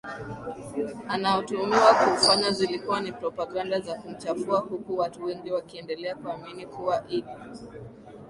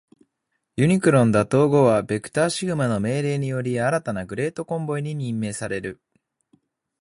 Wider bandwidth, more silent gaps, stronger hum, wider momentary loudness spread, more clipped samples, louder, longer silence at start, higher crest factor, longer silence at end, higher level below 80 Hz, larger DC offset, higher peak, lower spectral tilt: about the same, 11.5 kHz vs 11.5 kHz; neither; neither; first, 18 LU vs 11 LU; neither; second, -26 LUFS vs -22 LUFS; second, 0.05 s vs 0.75 s; about the same, 22 dB vs 18 dB; second, 0 s vs 1.05 s; second, -62 dBFS vs -54 dBFS; neither; about the same, -4 dBFS vs -4 dBFS; second, -3.5 dB/octave vs -6.5 dB/octave